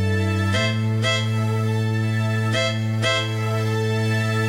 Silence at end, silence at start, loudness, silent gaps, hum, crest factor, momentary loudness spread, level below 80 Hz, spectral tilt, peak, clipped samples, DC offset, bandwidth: 0 s; 0 s; -21 LUFS; none; none; 12 dB; 2 LU; -56 dBFS; -5.5 dB/octave; -8 dBFS; under 0.1%; under 0.1%; 13.5 kHz